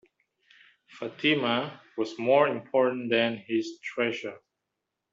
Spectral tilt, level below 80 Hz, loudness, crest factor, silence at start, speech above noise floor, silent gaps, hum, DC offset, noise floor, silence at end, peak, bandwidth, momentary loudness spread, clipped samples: -5.5 dB/octave; -76 dBFS; -27 LUFS; 20 dB; 0.95 s; 57 dB; none; none; under 0.1%; -84 dBFS; 0.75 s; -8 dBFS; 7.6 kHz; 14 LU; under 0.1%